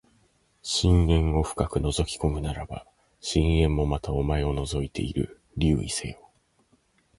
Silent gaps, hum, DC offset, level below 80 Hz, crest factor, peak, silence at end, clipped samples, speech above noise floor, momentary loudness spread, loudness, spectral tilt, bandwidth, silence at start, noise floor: none; none; under 0.1%; -32 dBFS; 18 dB; -8 dBFS; 1.05 s; under 0.1%; 41 dB; 13 LU; -26 LUFS; -5.5 dB/octave; 11.5 kHz; 0.65 s; -66 dBFS